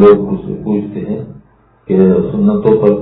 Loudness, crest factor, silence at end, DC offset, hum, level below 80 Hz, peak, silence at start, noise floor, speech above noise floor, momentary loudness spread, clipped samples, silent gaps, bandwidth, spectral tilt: -13 LUFS; 12 dB; 0 s; under 0.1%; none; -42 dBFS; 0 dBFS; 0 s; -46 dBFS; 35 dB; 12 LU; 0.5%; none; 4.1 kHz; -12.5 dB/octave